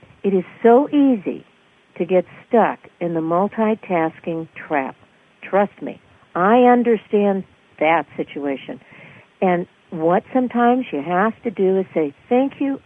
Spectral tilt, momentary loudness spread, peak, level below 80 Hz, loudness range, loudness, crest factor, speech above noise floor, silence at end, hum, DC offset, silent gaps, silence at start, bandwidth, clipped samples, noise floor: -9 dB/octave; 15 LU; -2 dBFS; -66 dBFS; 4 LU; -19 LUFS; 18 dB; 26 dB; 0.1 s; none; under 0.1%; none; 0.25 s; 3.7 kHz; under 0.1%; -44 dBFS